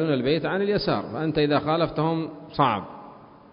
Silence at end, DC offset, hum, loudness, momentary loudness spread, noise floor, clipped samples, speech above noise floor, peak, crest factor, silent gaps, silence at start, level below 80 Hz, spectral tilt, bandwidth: 0.3 s; under 0.1%; none; -24 LUFS; 8 LU; -46 dBFS; under 0.1%; 22 dB; -6 dBFS; 18 dB; none; 0 s; -52 dBFS; -11 dB/octave; 5.4 kHz